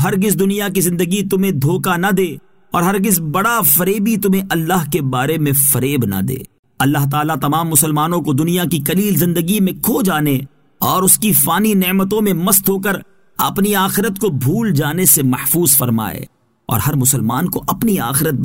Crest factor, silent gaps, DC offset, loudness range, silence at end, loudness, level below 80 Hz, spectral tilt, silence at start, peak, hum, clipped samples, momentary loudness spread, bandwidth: 16 dB; 6.59-6.63 s; 0.4%; 2 LU; 0 s; -14 LUFS; -46 dBFS; -4.5 dB/octave; 0 s; 0 dBFS; none; under 0.1%; 8 LU; 16.5 kHz